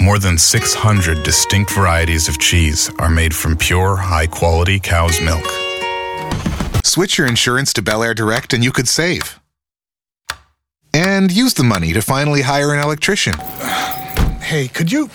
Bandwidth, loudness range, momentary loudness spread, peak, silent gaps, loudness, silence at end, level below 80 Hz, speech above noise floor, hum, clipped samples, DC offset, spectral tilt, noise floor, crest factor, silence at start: over 20 kHz; 3 LU; 8 LU; 0 dBFS; none; -14 LUFS; 0 s; -26 dBFS; over 76 dB; none; under 0.1%; under 0.1%; -3.5 dB/octave; under -90 dBFS; 14 dB; 0 s